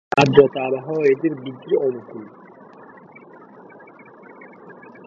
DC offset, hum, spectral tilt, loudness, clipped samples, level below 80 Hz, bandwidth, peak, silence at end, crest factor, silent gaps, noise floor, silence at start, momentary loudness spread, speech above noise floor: under 0.1%; none; -6.5 dB/octave; -19 LUFS; under 0.1%; -60 dBFS; 7.6 kHz; 0 dBFS; 0.35 s; 22 dB; none; -44 dBFS; 0.15 s; 28 LU; 26 dB